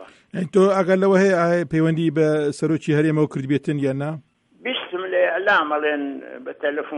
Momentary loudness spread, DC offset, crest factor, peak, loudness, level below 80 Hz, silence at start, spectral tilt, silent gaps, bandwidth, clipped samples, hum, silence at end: 13 LU; under 0.1%; 14 dB; -6 dBFS; -20 LUFS; -62 dBFS; 0 s; -6.5 dB/octave; none; 11 kHz; under 0.1%; none; 0 s